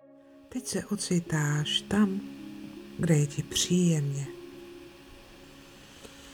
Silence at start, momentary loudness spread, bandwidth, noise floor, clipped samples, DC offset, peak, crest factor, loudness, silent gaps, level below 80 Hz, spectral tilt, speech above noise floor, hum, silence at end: 0.5 s; 24 LU; 18 kHz; -54 dBFS; under 0.1%; under 0.1%; -12 dBFS; 18 dB; -28 LUFS; none; -58 dBFS; -4.5 dB/octave; 26 dB; none; 0 s